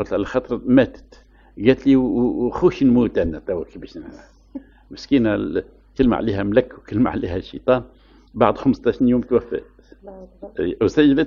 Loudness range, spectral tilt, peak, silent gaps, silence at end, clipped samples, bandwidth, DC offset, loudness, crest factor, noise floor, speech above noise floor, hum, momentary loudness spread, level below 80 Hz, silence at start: 4 LU; -8 dB/octave; 0 dBFS; none; 0 s; under 0.1%; 7 kHz; under 0.1%; -19 LUFS; 20 dB; -38 dBFS; 19 dB; none; 20 LU; -42 dBFS; 0 s